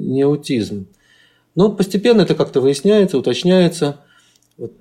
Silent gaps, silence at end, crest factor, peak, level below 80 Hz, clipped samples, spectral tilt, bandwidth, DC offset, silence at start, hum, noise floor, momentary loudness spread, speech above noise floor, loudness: none; 0.1 s; 14 dB; -2 dBFS; -54 dBFS; under 0.1%; -6.5 dB/octave; 13.5 kHz; under 0.1%; 0 s; none; -54 dBFS; 13 LU; 39 dB; -16 LUFS